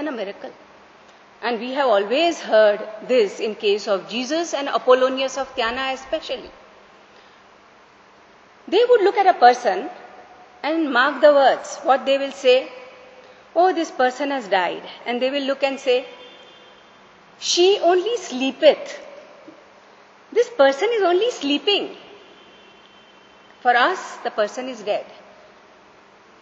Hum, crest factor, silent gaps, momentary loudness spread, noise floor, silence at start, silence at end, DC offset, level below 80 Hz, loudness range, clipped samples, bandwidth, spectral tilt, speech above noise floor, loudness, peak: none; 20 dB; none; 14 LU; -50 dBFS; 0 s; 1.3 s; under 0.1%; -66 dBFS; 6 LU; under 0.1%; 8.2 kHz; -2.5 dB/octave; 31 dB; -19 LUFS; 0 dBFS